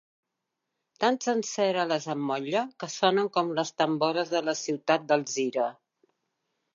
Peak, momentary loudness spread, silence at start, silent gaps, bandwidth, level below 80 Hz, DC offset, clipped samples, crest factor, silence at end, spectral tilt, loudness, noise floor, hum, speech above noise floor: -8 dBFS; 5 LU; 1 s; none; 7.6 kHz; -84 dBFS; under 0.1%; under 0.1%; 20 dB; 1.05 s; -4 dB/octave; -28 LUFS; -84 dBFS; none; 57 dB